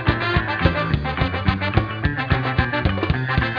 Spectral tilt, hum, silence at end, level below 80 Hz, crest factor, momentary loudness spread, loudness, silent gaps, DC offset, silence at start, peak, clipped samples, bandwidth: -8.5 dB/octave; none; 0 s; -30 dBFS; 18 dB; 3 LU; -21 LUFS; none; under 0.1%; 0 s; -2 dBFS; under 0.1%; 5.4 kHz